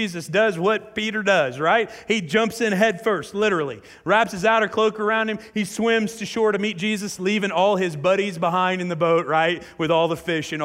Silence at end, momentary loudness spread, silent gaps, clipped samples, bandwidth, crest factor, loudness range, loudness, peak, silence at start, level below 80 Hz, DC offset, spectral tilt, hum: 0 s; 6 LU; none; under 0.1%; 16 kHz; 16 dB; 1 LU; -21 LUFS; -6 dBFS; 0 s; -60 dBFS; under 0.1%; -4.5 dB/octave; none